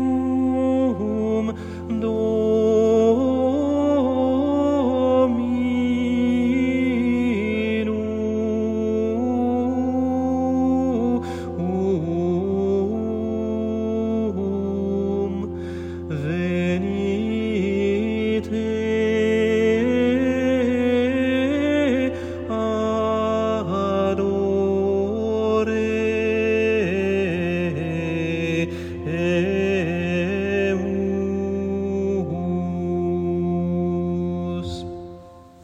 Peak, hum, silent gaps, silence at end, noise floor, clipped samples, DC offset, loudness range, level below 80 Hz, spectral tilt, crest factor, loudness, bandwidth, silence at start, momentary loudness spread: -6 dBFS; none; none; 0 s; -43 dBFS; under 0.1%; under 0.1%; 4 LU; -52 dBFS; -7.5 dB/octave; 14 dB; -22 LUFS; 8.4 kHz; 0 s; 6 LU